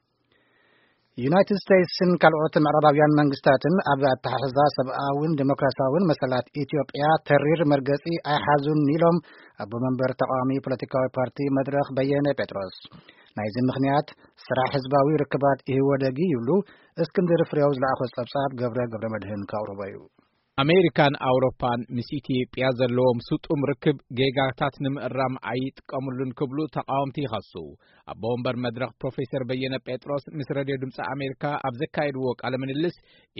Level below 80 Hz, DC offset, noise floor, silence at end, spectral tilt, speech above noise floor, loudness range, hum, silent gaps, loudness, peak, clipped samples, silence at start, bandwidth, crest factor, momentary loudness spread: -60 dBFS; under 0.1%; -67 dBFS; 0.5 s; -5.5 dB/octave; 43 dB; 9 LU; none; none; -24 LUFS; 0 dBFS; under 0.1%; 1.15 s; 5.8 kHz; 24 dB; 11 LU